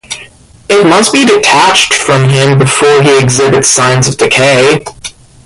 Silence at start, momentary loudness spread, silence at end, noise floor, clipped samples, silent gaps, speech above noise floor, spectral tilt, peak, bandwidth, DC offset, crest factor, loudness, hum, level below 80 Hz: 0.1 s; 10 LU; 0.35 s; -35 dBFS; 0.2%; none; 28 dB; -3.5 dB/octave; 0 dBFS; 15 kHz; under 0.1%; 8 dB; -6 LUFS; none; -40 dBFS